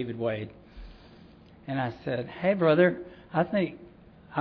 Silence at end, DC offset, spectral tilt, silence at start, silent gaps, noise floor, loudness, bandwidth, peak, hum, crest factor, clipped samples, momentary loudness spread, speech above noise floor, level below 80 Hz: 0 s; under 0.1%; -10 dB/octave; 0 s; none; -52 dBFS; -28 LUFS; 5.4 kHz; -10 dBFS; none; 20 dB; under 0.1%; 17 LU; 25 dB; -56 dBFS